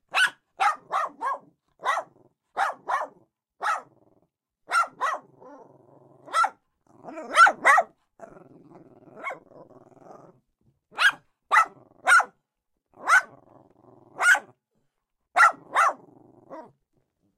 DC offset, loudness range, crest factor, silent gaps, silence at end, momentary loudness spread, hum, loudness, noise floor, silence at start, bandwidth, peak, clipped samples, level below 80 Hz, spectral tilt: under 0.1%; 8 LU; 22 dB; none; 0.75 s; 19 LU; none; -23 LUFS; -80 dBFS; 0.15 s; 15.5 kHz; -4 dBFS; under 0.1%; -76 dBFS; 0 dB/octave